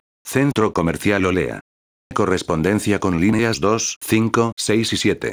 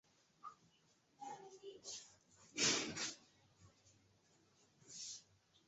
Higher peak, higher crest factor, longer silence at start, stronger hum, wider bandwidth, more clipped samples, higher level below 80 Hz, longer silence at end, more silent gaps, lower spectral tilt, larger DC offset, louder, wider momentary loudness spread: first, -2 dBFS vs -24 dBFS; second, 18 dB vs 26 dB; second, 0.25 s vs 0.45 s; neither; first, over 20 kHz vs 8 kHz; neither; first, -48 dBFS vs -84 dBFS; second, 0 s vs 0.45 s; first, 1.61-2.10 s, 3.96-4.01 s, 4.52-4.57 s vs none; first, -5 dB/octave vs -1 dB/octave; neither; first, -19 LUFS vs -42 LUFS; second, 5 LU vs 23 LU